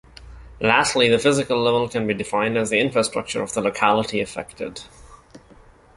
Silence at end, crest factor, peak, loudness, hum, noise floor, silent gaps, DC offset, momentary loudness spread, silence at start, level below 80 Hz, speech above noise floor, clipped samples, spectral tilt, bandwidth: 0.6 s; 20 dB; -2 dBFS; -20 LUFS; none; -49 dBFS; none; under 0.1%; 13 LU; 0.2 s; -50 dBFS; 29 dB; under 0.1%; -4 dB/octave; 11.5 kHz